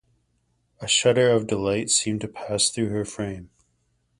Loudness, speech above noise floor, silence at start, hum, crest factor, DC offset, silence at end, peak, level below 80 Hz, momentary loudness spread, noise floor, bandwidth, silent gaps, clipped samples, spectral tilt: -22 LUFS; 46 dB; 0.8 s; none; 18 dB; under 0.1%; 0.75 s; -6 dBFS; -54 dBFS; 13 LU; -70 dBFS; 11.5 kHz; none; under 0.1%; -3 dB/octave